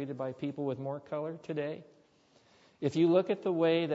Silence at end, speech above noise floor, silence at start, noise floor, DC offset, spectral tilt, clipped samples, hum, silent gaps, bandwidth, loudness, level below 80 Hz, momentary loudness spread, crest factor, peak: 0 s; 34 dB; 0 s; -66 dBFS; under 0.1%; -7.5 dB/octave; under 0.1%; none; none; 8 kHz; -32 LUFS; -80 dBFS; 11 LU; 18 dB; -14 dBFS